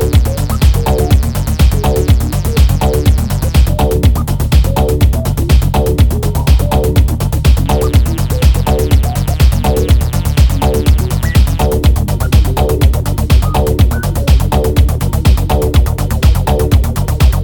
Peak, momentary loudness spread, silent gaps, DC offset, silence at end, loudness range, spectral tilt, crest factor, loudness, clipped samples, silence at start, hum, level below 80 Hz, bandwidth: 0 dBFS; 2 LU; none; under 0.1%; 0 s; 0 LU; -6.5 dB/octave; 10 dB; -12 LUFS; under 0.1%; 0 s; none; -12 dBFS; 18 kHz